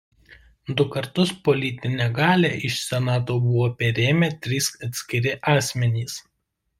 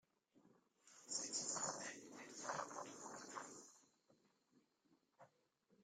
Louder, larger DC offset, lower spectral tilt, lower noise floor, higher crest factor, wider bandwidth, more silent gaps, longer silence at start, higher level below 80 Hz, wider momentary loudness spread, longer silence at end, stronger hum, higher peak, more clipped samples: first, -22 LUFS vs -48 LUFS; neither; first, -5 dB/octave vs -1 dB/octave; second, -75 dBFS vs -81 dBFS; second, 18 dB vs 24 dB; about the same, 16 kHz vs 15.5 kHz; neither; about the same, 0.3 s vs 0.35 s; first, -56 dBFS vs under -90 dBFS; second, 7 LU vs 17 LU; first, 0.6 s vs 0 s; neither; first, -4 dBFS vs -30 dBFS; neither